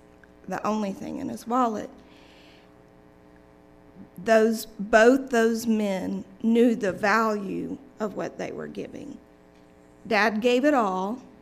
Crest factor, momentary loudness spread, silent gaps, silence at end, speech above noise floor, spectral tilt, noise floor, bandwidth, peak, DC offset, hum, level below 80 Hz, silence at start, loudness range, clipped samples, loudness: 22 dB; 15 LU; none; 0.15 s; 29 dB; -5 dB/octave; -53 dBFS; 15.5 kHz; -4 dBFS; under 0.1%; none; -60 dBFS; 0.45 s; 9 LU; under 0.1%; -24 LUFS